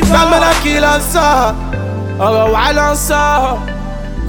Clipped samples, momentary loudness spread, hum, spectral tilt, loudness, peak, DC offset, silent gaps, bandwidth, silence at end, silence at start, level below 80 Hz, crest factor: under 0.1%; 11 LU; none; -4 dB/octave; -12 LUFS; 0 dBFS; under 0.1%; none; 17.5 kHz; 0 s; 0 s; -22 dBFS; 12 dB